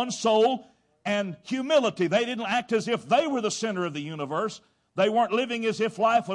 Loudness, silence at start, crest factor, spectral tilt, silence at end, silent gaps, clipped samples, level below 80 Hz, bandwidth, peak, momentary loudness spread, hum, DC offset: -26 LUFS; 0 s; 16 dB; -4.5 dB/octave; 0 s; none; under 0.1%; -72 dBFS; 11.5 kHz; -10 dBFS; 9 LU; none; under 0.1%